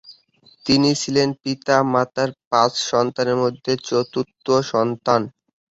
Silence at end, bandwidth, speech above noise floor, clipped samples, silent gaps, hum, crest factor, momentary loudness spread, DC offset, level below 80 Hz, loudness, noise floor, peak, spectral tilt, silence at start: 0.5 s; 8 kHz; 35 dB; under 0.1%; 2.47-2.51 s; none; 20 dB; 7 LU; under 0.1%; -58 dBFS; -20 LUFS; -55 dBFS; -2 dBFS; -4.5 dB/octave; 0.1 s